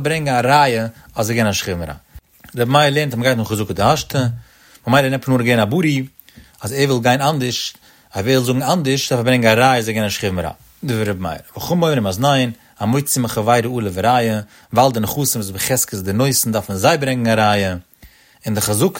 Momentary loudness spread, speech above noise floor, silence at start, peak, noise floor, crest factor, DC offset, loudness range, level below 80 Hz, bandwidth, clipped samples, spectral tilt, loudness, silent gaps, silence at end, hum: 11 LU; 30 dB; 0 s; 0 dBFS; -47 dBFS; 16 dB; under 0.1%; 2 LU; -46 dBFS; 16.5 kHz; under 0.1%; -4.5 dB/octave; -17 LUFS; none; 0 s; none